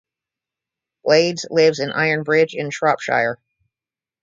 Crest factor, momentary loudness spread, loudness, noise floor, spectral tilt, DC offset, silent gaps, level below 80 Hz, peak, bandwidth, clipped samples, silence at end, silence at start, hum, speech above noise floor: 18 dB; 6 LU; -18 LUFS; under -90 dBFS; -4.5 dB/octave; under 0.1%; none; -66 dBFS; -2 dBFS; 7.6 kHz; under 0.1%; 0.85 s; 1.05 s; none; over 72 dB